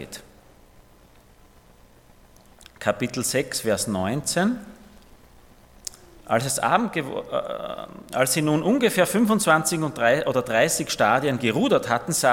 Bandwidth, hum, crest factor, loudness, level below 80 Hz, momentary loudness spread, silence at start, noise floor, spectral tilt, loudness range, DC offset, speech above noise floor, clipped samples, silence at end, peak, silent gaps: 17.5 kHz; none; 22 dB; -22 LUFS; -56 dBFS; 13 LU; 0 s; -53 dBFS; -4 dB/octave; 8 LU; under 0.1%; 30 dB; under 0.1%; 0 s; -4 dBFS; none